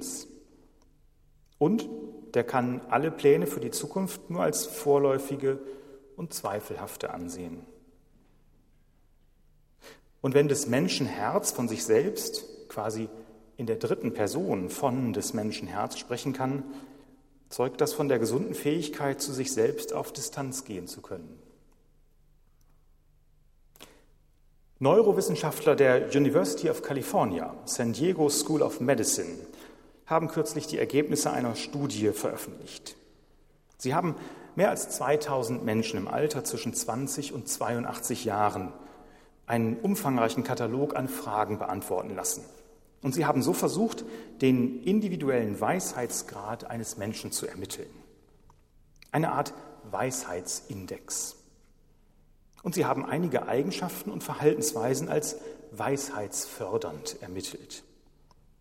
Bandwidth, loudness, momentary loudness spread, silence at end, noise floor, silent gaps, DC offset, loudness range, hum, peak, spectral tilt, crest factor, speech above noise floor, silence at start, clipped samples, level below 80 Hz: 16.5 kHz; -29 LUFS; 14 LU; 0.8 s; -62 dBFS; none; under 0.1%; 8 LU; none; -8 dBFS; -4.5 dB/octave; 22 dB; 33 dB; 0 s; under 0.1%; -62 dBFS